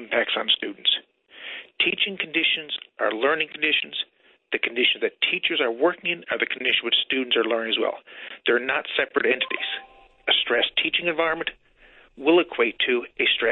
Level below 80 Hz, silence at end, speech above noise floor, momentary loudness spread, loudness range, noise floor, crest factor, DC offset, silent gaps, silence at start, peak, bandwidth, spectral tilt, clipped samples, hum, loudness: -64 dBFS; 0 s; 30 dB; 10 LU; 1 LU; -54 dBFS; 18 dB; under 0.1%; none; 0 s; -6 dBFS; 4.2 kHz; -6.5 dB/octave; under 0.1%; none; -23 LUFS